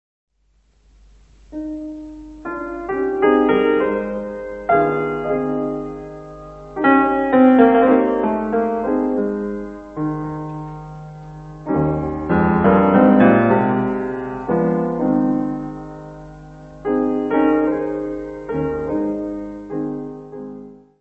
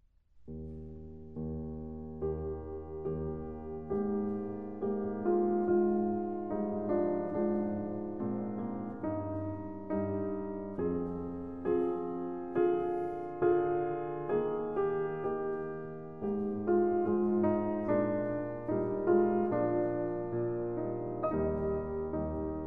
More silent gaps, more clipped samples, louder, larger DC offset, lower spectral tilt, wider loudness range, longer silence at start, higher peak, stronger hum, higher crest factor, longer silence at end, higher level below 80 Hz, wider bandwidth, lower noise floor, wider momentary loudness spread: neither; neither; first, -18 LUFS vs -34 LUFS; second, under 0.1% vs 0.2%; second, -9.5 dB/octave vs -11.5 dB/octave; about the same, 8 LU vs 6 LU; first, 1.5 s vs 0 s; first, 0 dBFS vs -16 dBFS; neither; about the same, 18 dB vs 18 dB; first, 0.25 s vs 0 s; first, -44 dBFS vs -54 dBFS; first, 4.2 kHz vs 3.2 kHz; about the same, -59 dBFS vs -56 dBFS; first, 22 LU vs 11 LU